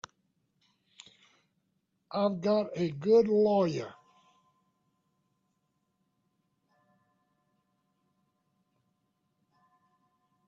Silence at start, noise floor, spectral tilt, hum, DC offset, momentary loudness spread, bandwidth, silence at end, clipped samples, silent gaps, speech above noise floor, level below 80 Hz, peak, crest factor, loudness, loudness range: 2.1 s; -78 dBFS; -7.5 dB/octave; none; under 0.1%; 14 LU; 7.6 kHz; 6.55 s; under 0.1%; none; 51 dB; -76 dBFS; -14 dBFS; 20 dB; -28 LUFS; 6 LU